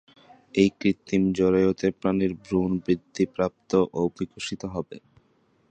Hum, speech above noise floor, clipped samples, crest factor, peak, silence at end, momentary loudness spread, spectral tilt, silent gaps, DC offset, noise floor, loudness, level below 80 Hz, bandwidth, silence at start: none; 40 dB; under 0.1%; 20 dB; -6 dBFS; 0.75 s; 11 LU; -6.5 dB/octave; none; under 0.1%; -65 dBFS; -25 LUFS; -52 dBFS; 9 kHz; 0.55 s